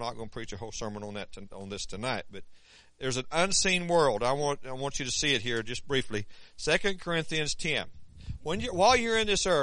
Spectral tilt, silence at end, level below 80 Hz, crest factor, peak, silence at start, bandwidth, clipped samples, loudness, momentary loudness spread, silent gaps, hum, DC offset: -3 dB/octave; 0 s; -48 dBFS; 20 dB; -10 dBFS; 0 s; 10.5 kHz; under 0.1%; -29 LUFS; 16 LU; none; none; under 0.1%